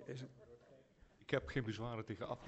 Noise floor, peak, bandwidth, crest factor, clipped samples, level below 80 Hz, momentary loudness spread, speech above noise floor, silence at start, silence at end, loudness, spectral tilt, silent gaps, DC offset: -67 dBFS; -22 dBFS; 8.2 kHz; 24 dB; under 0.1%; -64 dBFS; 22 LU; 24 dB; 0 s; 0 s; -44 LUFS; -6.5 dB/octave; none; under 0.1%